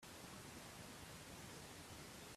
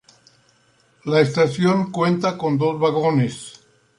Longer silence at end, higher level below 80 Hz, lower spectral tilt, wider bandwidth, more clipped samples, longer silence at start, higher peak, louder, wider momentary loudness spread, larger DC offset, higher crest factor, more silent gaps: second, 0 s vs 0.45 s; second, -72 dBFS vs -62 dBFS; second, -3 dB/octave vs -6.5 dB/octave; first, 15.5 kHz vs 11 kHz; neither; second, 0 s vs 1.05 s; second, -42 dBFS vs -4 dBFS; second, -55 LUFS vs -19 LUFS; second, 0 LU vs 10 LU; neither; about the same, 14 dB vs 18 dB; neither